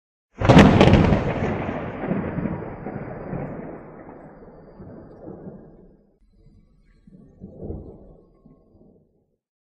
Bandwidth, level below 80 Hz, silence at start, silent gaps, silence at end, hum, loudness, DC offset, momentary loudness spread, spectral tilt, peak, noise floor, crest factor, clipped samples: 10 kHz; -36 dBFS; 0.4 s; none; 1.7 s; none; -19 LUFS; under 0.1%; 29 LU; -7.5 dB/octave; 0 dBFS; -65 dBFS; 24 dB; under 0.1%